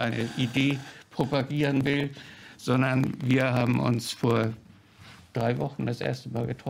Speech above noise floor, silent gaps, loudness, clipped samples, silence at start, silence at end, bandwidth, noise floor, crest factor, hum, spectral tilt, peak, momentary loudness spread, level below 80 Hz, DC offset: 25 dB; none; -27 LUFS; under 0.1%; 0 s; 0 s; 16 kHz; -51 dBFS; 18 dB; none; -6.5 dB/octave; -10 dBFS; 11 LU; -58 dBFS; under 0.1%